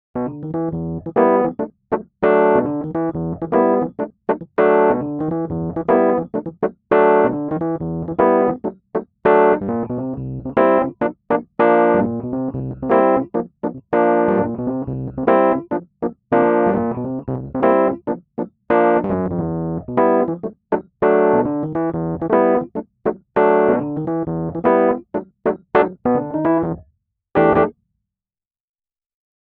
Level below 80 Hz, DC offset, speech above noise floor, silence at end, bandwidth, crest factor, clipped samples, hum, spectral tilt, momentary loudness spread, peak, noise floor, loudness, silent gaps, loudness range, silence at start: -48 dBFS; under 0.1%; over 71 dB; 1.7 s; 4.3 kHz; 16 dB; under 0.1%; none; -11 dB/octave; 11 LU; -2 dBFS; under -90 dBFS; -18 LUFS; none; 2 LU; 0.15 s